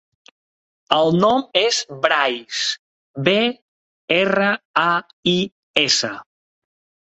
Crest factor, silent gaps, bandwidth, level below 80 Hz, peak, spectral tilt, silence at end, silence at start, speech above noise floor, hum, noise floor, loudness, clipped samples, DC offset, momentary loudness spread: 20 dB; 2.79-3.14 s, 3.62-4.08 s, 4.65-4.74 s, 5.13-5.23 s, 5.52-5.74 s; 8.2 kHz; -62 dBFS; 0 dBFS; -3.5 dB/octave; 0.8 s; 0.9 s; over 72 dB; none; under -90 dBFS; -18 LUFS; under 0.1%; under 0.1%; 7 LU